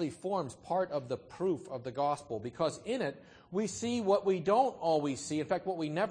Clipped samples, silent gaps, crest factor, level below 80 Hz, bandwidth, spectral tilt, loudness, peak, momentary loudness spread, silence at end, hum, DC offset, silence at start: under 0.1%; none; 18 dB; -70 dBFS; 9.8 kHz; -5.5 dB/octave; -34 LUFS; -16 dBFS; 9 LU; 0 s; none; under 0.1%; 0 s